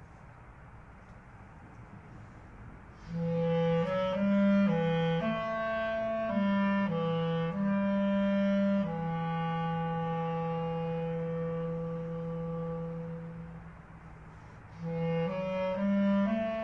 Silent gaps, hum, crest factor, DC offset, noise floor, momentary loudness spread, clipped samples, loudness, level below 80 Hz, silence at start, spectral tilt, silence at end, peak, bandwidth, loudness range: none; none; 14 dB; under 0.1%; -52 dBFS; 22 LU; under 0.1%; -31 LUFS; -56 dBFS; 0 s; -9 dB/octave; 0 s; -18 dBFS; 6.2 kHz; 9 LU